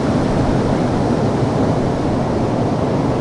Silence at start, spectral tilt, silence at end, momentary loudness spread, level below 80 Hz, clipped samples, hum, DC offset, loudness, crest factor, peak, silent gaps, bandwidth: 0 s; -7.5 dB/octave; 0 s; 1 LU; -32 dBFS; under 0.1%; none; under 0.1%; -17 LUFS; 12 dB; -4 dBFS; none; 11 kHz